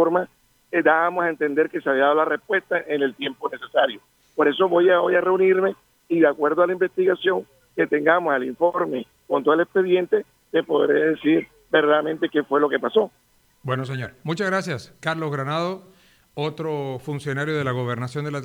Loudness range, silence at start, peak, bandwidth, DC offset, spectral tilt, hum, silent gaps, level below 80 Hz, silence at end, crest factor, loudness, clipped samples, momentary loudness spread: 7 LU; 0 s; -4 dBFS; 12.5 kHz; under 0.1%; -6.5 dB/octave; none; none; -66 dBFS; 0 s; 18 dB; -22 LUFS; under 0.1%; 11 LU